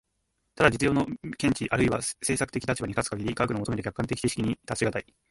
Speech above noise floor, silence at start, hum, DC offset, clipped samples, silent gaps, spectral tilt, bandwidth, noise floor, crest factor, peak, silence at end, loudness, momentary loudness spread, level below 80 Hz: 49 dB; 0.55 s; none; under 0.1%; under 0.1%; none; -5 dB/octave; 12 kHz; -77 dBFS; 24 dB; -4 dBFS; 0.3 s; -28 LUFS; 7 LU; -50 dBFS